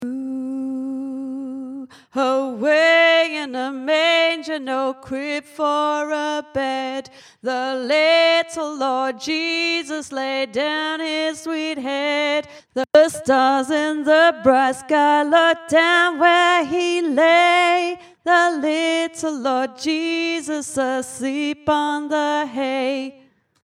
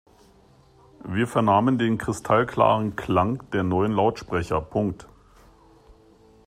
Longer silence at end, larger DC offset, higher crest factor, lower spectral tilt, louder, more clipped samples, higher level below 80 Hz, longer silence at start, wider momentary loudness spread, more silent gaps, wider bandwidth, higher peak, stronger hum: about the same, 0.55 s vs 0.55 s; neither; about the same, 18 dB vs 20 dB; second, -2.5 dB/octave vs -7 dB/octave; first, -19 LUFS vs -23 LUFS; neither; second, -64 dBFS vs -52 dBFS; second, 0 s vs 1.05 s; first, 12 LU vs 9 LU; neither; about the same, 13.5 kHz vs 14 kHz; first, 0 dBFS vs -6 dBFS; neither